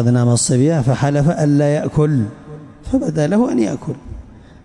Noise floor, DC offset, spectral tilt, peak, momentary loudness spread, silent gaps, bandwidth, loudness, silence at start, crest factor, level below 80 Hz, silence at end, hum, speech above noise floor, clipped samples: -36 dBFS; under 0.1%; -6.5 dB/octave; -6 dBFS; 20 LU; none; 11.5 kHz; -16 LUFS; 0 s; 10 dB; -40 dBFS; 0.25 s; none; 22 dB; under 0.1%